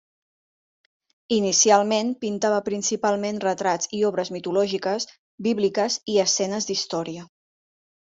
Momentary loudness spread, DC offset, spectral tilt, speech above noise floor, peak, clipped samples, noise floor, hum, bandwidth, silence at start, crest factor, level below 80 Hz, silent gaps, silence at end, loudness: 10 LU; under 0.1%; -3 dB/octave; over 67 dB; -4 dBFS; under 0.1%; under -90 dBFS; none; 7.8 kHz; 1.3 s; 22 dB; -68 dBFS; 5.19-5.38 s; 0.9 s; -23 LUFS